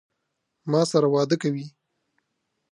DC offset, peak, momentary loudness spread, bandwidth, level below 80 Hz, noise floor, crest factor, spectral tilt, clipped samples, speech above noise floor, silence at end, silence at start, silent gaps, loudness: under 0.1%; -8 dBFS; 17 LU; 11.5 kHz; -78 dBFS; -78 dBFS; 18 dB; -6 dB/octave; under 0.1%; 56 dB; 1.05 s; 0.65 s; none; -23 LUFS